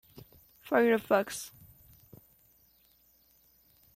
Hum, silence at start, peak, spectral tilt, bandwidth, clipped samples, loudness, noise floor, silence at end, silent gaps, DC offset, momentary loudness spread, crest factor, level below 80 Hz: none; 0.15 s; -12 dBFS; -4.5 dB/octave; 16.5 kHz; under 0.1%; -29 LUFS; -66 dBFS; 2.5 s; none; under 0.1%; 20 LU; 22 dB; -70 dBFS